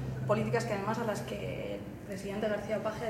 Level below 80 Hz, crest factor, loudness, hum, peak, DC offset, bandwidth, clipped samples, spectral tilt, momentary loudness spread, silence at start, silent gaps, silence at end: -56 dBFS; 18 dB; -34 LUFS; none; -16 dBFS; under 0.1%; 16 kHz; under 0.1%; -6 dB/octave; 10 LU; 0 s; none; 0 s